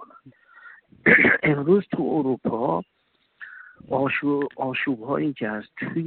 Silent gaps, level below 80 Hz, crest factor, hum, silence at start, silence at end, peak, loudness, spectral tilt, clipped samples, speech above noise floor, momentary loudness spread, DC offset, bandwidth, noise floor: none; -60 dBFS; 20 dB; none; 0 s; 0 s; -4 dBFS; -22 LUFS; -10 dB/octave; under 0.1%; 27 dB; 15 LU; under 0.1%; 4.4 kHz; -51 dBFS